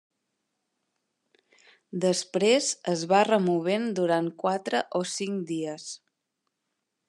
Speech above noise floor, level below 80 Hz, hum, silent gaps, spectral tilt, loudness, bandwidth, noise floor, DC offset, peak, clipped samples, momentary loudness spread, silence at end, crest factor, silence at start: 56 dB; -84 dBFS; none; none; -4 dB/octave; -26 LUFS; 12 kHz; -82 dBFS; under 0.1%; -8 dBFS; under 0.1%; 12 LU; 1.1 s; 20 dB; 1.95 s